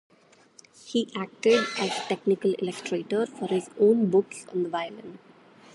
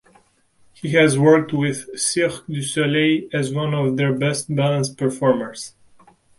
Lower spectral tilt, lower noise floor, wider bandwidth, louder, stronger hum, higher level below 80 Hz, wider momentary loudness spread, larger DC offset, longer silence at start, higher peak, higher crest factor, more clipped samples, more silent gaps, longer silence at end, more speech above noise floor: about the same, -5 dB/octave vs -5 dB/octave; about the same, -56 dBFS vs -58 dBFS; about the same, 11.5 kHz vs 11.5 kHz; second, -26 LUFS vs -19 LUFS; neither; second, -76 dBFS vs -60 dBFS; about the same, 11 LU vs 9 LU; neither; about the same, 0.85 s vs 0.85 s; second, -8 dBFS vs -2 dBFS; about the same, 18 dB vs 18 dB; neither; neither; second, 0.55 s vs 0.7 s; second, 30 dB vs 39 dB